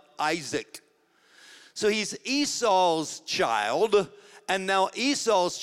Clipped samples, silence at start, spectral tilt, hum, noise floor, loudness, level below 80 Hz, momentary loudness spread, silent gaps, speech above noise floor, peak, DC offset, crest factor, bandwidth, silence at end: under 0.1%; 0.2 s; -2.5 dB/octave; none; -63 dBFS; -26 LUFS; -68 dBFS; 10 LU; none; 38 dB; -10 dBFS; under 0.1%; 18 dB; 15.5 kHz; 0 s